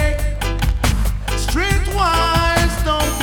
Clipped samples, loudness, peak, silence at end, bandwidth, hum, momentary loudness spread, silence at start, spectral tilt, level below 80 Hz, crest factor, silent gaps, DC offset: under 0.1%; -18 LUFS; -2 dBFS; 0 s; 19 kHz; none; 6 LU; 0 s; -4.5 dB/octave; -20 dBFS; 14 dB; none; under 0.1%